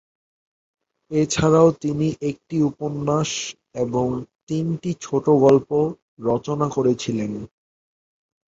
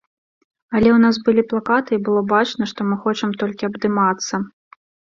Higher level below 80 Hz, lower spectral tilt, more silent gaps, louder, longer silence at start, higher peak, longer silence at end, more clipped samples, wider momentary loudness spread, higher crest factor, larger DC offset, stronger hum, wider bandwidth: about the same, -54 dBFS vs -52 dBFS; about the same, -6 dB/octave vs -5.5 dB/octave; first, 4.35-4.47 s, 6.02-6.17 s vs none; second, -21 LUFS vs -18 LUFS; first, 1.1 s vs 0.7 s; about the same, -2 dBFS vs -2 dBFS; first, 1 s vs 0.65 s; neither; first, 13 LU vs 9 LU; about the same, 20 dB vs 16 dB; neither; neither; about the same, 8 kHz vs 7.4 kHz